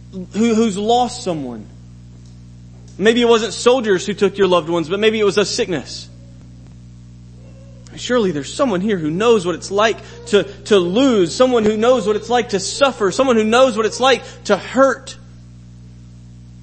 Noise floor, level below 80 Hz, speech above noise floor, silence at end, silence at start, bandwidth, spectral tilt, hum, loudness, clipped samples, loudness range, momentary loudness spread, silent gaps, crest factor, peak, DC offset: -39 dBFS; -46 dBFS; 23 dB; 0.05 s; 0 s; 8.8 kHz; -4.5 dB/octave; 60 Hz at -40 dBFS; -16 LUFS; under 0.1%; 6 LU; 11 LU; none; 18 dB; 0 dBFS; under 0.1%